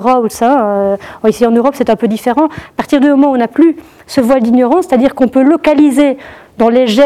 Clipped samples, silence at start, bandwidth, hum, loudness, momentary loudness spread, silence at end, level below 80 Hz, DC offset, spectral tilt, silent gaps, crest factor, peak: under 0.1%; 0 s; 14.5 kHz; none; -10 LUFS; 6 LU; 0 s; -46 dBFS; 0.2%; -5.5 dB/octave; none; 10 dB; 0 dBFS